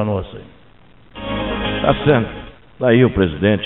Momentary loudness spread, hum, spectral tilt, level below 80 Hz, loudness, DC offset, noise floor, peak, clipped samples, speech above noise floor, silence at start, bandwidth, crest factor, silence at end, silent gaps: 19 LU; none; -5.5 dB/octave; -36 dBFS; -17 LUFS; 0.4%; -48 dBFS; 0 dBFS; under 0.1%; 33 dB; 0 s; 4.1 kHz; 18 dB; 0 s; none